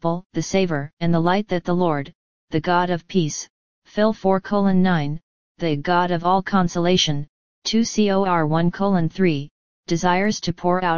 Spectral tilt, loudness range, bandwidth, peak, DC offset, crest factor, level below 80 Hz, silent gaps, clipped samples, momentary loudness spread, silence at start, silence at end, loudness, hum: -5.5 dB/octave; 2 LU; 7.2 kHz; -4 dBFS; 2%; 16 dB; -48 dBFS; 0.26-0.30 s, 0.93-0.97 s, 2.15-2.48 s, 3.50-3.82 s, 5.23-5.55 s, 7.29-7.62 s, 9.51-9.83 s; under 0.1%; 10 LU; 0 s; 0 s; -21 LUFS; none